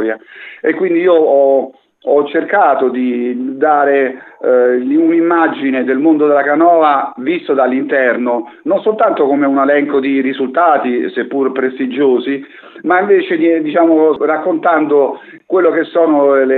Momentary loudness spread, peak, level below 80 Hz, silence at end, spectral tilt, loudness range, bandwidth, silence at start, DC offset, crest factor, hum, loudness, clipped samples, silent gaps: 8 LU; 0 dBFS; -72 dBFS; 0 s; -8.5 dB/octave; 2 LU; 4.2 kHz; 0 s; under 0.1%; 12 dB; none; -12 LUFS; under 0.1%; none